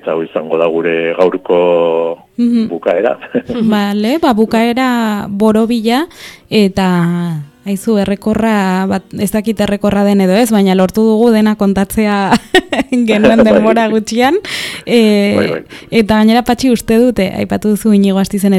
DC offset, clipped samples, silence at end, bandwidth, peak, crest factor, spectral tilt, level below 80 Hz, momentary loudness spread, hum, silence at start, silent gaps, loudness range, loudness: under 0.1%; 0.2%; 0 s; 15 kHz; 0 dBFS; 12 dB; -6 dB/octave; -40 dBFS; 7 LU; none; 0.05 s; none; 3 LU; -12 LUFS